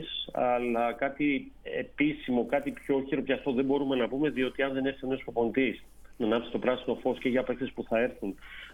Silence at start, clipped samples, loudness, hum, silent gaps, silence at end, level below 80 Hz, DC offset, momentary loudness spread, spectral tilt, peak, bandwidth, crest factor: 0 s; under 0.1%; -30 LUFS; none; none; 0 s; -56 dBFS; under 0.1%; 7 LU; -7 dB/octave; -12 dBFS; 12 kHz; 18 dB